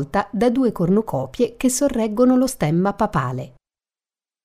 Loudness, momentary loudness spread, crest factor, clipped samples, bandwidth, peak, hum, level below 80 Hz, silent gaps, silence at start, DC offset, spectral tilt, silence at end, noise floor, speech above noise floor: -20 LUFS; 9 LU; 16 dB; under 0.1%; 16 kHz; -4 dBFS; none; -46 dBFS; none; 0 s; under 0.1%; -6 dB/octave; 0.95 s; under -90 dBFS; over 71 dB